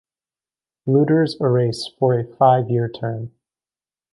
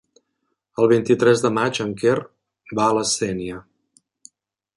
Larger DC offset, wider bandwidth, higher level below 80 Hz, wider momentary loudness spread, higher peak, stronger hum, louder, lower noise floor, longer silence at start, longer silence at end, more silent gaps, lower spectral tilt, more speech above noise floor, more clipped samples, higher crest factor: neither; about the same, 11.5 kHz vs 11.5 kHz; about the same, -60 dBFS vs -58 dBFS; about the same, 13 LU vs 14 LU; about the same, -2 dBFS vs -4 dBFS; neither; about the same, -19 LUFS vs -20 LUFS; first, under -90 dBFS vs -75 dBFS; about the same, 0.85 s vs 0.8 s; second, 0.85 s vs 1.15 s; neither; first, -8 dB/octave vs -4.5 dB/octave; first, over 72 dB vs 56 dB; neither; about the same, 18 dB vs 18 dB